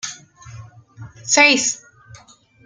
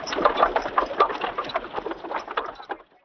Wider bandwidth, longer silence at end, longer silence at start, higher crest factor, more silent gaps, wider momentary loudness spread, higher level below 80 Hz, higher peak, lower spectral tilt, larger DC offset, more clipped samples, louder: first, 11 kHz vs 5.4 kHz; first, 0.9 s vs 0.2 s; about the same, 0.05 s vs 0 s; about the same, 22 dB vs 22 dB; neither; first, 20 LU vs 12 LU; second, -60 dBFS vs -52 dBFS; first, 0 dBFS vs -4 dBFS; second, -1 dB/octave vs -3.5 dB/octave; neither; neither; first, -14 LUFS vs -25 LUFS